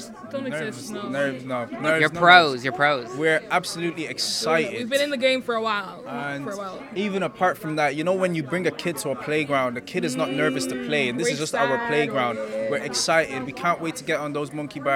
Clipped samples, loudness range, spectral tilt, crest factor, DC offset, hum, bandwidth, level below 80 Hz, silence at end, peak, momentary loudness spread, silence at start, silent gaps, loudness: under 0.1%; 5 LU; -4 dB/octave; 24 dB; under 0.1%; none; 17 kHz; -64 dBFS; 0 s; 0 dBFS; 9 LU; 0 s; none; -23 LUFS